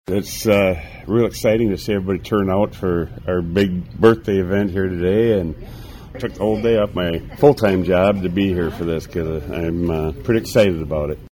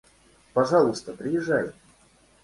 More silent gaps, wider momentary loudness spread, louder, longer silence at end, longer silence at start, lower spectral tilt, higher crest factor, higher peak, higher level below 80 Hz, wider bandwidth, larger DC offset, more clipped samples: neither; about the same, 9 LU vs 11 LU; first, -19 LUFS vs -25 LUFS; second, 0.05 s vs 0.75 s; second, 0.1 s vs 0.55 s; about the same, -6.5 dB/octave vs -6 dB/octave; about the same, 18 dB vs 18 dB; first, 0 dBFS vs -8 dBFS; first, -38 dBFS vs -62 dBFS; first, 17.5 kHz vs 11.5 kHz; neither; neither